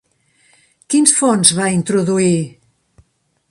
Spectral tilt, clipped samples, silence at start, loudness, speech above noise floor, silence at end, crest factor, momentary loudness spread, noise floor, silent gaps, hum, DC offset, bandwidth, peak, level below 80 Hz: -3.5 dB/octave; under 0.1%; 0.9 s; -13 LUFS; 46 dB; 1 s; 18 dB; 8 LU; -60 dBFS; none; none; under 0.1%; 16 kHz; 0 dBFS; -56 dBFS